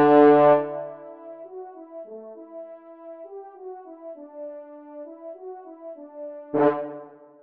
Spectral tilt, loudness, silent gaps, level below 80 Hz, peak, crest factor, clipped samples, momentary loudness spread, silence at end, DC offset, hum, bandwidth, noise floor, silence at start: -9.5 dB/octave; -19 LUFS; none; -80 dBFS; -4 dBFS; 20 dB; under 0.1%; 24 LU; 0.4 s; under 0.1%; none; 4.7 kHz; -43 dBFS; 0 s